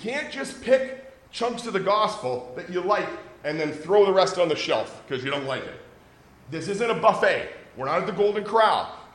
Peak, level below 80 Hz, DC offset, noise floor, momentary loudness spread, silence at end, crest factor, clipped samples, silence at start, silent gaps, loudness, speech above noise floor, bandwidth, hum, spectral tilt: -4 dBFS; -62 dBFS; under 0.1%; -52 dBFS; 14 LU; 0.05 s; 20 dB; under 0.1%; 0 s; none; -24 LUFS; 28 dB; 11.5 kHz; none; -4.5 dB/octave